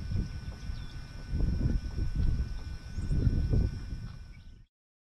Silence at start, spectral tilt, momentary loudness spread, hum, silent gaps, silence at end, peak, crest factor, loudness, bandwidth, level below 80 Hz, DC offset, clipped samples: 0 s; -8 dB/octave; 15 LU; none; none; 0.5 s; -16 dBFS; 16 dB; -34 LUFS; 9.4 kHz; -34 dBFS; under 0.1%; under 0.1%